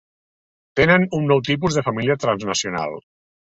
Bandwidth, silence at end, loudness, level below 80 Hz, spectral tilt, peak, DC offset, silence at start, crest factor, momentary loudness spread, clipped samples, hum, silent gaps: 8.2 kHz; 0.6 s; -19 LUFS; -50 dBFS; -5 dB/octave; -2 dBFS; under 0.1%; 0.75 s; 18 dB; 12 LU; under 0.1%; none; none